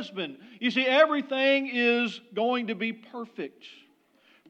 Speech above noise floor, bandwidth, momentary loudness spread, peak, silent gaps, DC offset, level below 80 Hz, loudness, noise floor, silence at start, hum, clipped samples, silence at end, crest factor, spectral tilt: 36 dB; 8.4 kHz; 17 LU; -8 dBFS; none; under 0.1%; under -90 dBFS; -25 LUFS; -63 dBFS; 0 s; none; under 0.1%; 0.75 s; 20 dB; -5 dB/octave